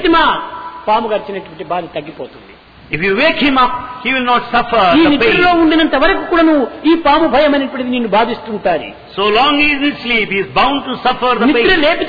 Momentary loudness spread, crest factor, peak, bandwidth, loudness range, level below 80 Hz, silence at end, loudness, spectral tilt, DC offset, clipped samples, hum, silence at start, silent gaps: 12 LU; 12 dB; -2 dBFS; 5 kHz; 5 LU; -36 dBFS; 0 s; -12 LUFS; -6.5 dB/octave; under 0.1%; under 0.1%; none; 0 s; none